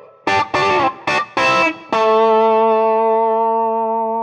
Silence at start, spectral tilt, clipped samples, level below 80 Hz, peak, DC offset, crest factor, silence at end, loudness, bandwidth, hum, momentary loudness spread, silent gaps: 0.25 s; -4 dB/octave; under 0.1%; -56 dBFS; -4 dBFS; under 0.1%; 10 dB; 0 s; -15 LUFS; 9.6 kHz; none; 5 LU; none